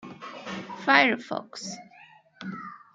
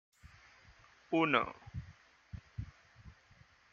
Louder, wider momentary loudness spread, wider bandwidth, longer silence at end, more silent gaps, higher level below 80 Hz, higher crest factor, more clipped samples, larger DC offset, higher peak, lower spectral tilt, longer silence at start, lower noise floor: first, -24 LUFS vs -35 LUFS; second, 21 LU vs 29 LU; first, 9.4 kHz vs 7.2 kHz; second, 0.15 s vs 0.6 s; neither; second, -74 dBFS vs -60 dBFS; about the same, 26 dB vs 28 dB; neither; neither; first, -4 dBFS vs -12 dBFS; second, -3.5 dB/octave vs -6.5 dB/octave; second, 0 s vs 0.25 s; second, -54 dBFS vs -65 dBFS